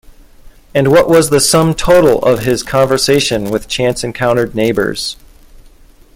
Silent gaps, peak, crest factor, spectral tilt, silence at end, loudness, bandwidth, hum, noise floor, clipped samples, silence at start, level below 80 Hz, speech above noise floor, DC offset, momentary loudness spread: none; 0 dBFS; 12 dB; -4.5 dB/octave; 1 s; -12 LUFS; 17 kHz; none; -41 dBFS; under 0.1%; 0.45 s; -36 dBFS; 30 dB; under 0.1%; 9 LU